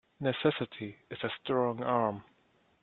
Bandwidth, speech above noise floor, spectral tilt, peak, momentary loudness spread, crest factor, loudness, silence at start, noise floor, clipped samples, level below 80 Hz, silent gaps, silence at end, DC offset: 4.3 kHz; 37 dB; -9 dB/octave; -12 dBFS; 12 LU; 22 dB; -33 LUFS; 0.2 s; -69 dBFS; under 0.1%; -72 dBFS; none; 0.6 s; under 0.1%